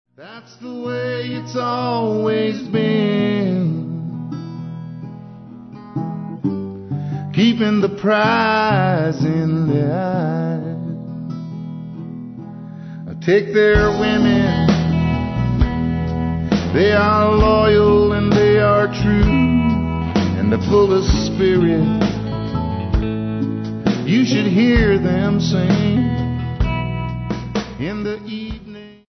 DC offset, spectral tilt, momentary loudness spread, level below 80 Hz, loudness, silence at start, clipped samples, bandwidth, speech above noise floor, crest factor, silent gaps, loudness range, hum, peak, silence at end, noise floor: under 0.1%; -7.5 dB/octave; 16 LU; -30 dBFS; -17 LUFS; 0.2 s; under 0.1%; 6.4 kHz; 22 dB; 16 dB; none; 9 LU; none; -2 dBFS; 0.15 s; -37 dBFS